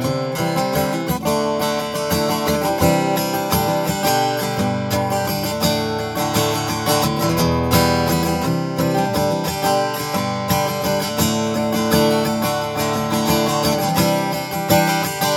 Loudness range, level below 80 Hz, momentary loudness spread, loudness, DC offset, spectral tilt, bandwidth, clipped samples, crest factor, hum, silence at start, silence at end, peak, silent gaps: 1 LU; -40 dBFS; 5 LU; -19 LUFS; under 0.1%; -4.5 dB/octave; over 20 kHz; under 0.1%; 16 dB; none; 0 s; 0 s; -2 dBFS; none